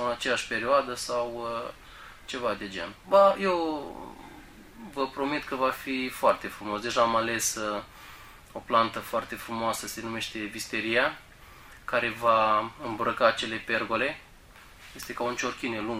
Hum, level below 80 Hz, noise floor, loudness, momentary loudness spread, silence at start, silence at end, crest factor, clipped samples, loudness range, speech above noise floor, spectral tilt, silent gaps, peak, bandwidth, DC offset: none; -56 dBFS; -52 dBFS; -28 LUFS; 19 LU; 0 s; 0 s; 22 dB; under 0.1%; 3 LU; 23 dB; -3 dB/octave; none; -8 dBFS; 16 kHz; under 0.1%